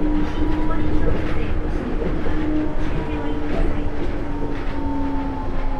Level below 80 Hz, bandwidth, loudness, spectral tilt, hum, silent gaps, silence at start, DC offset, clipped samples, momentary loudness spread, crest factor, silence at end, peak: -24 dBFS; 5.6 kHz; -25 LUFS; -8 dB/octave; none; none; 0 s; under 0.1%; under 0.1%; 4 LU; 14 dB; 0 s; -4 dBFS